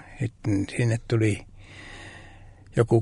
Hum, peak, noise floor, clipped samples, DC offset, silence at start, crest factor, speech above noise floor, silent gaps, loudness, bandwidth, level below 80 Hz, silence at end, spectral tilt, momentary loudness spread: none; -8 dBFS; -47 dBFS; under 0.1%; under 0.1%; 0.05 s; 20 dB; 24 dB; none; -26 LUFS; 11 kHz; -48 dBFS; 0 s; -7 dB/octave; 20 LU